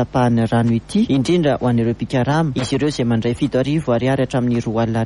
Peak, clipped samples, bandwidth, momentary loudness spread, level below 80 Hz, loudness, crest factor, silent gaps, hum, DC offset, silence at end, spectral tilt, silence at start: -6 dBFS; under 0.1%; 11.5 kHz; 3 LU; -42 dBFS; -18 LUFS; 12 dB; none; none; under 0.1%; 0 s; -7 dB/octave; 0 s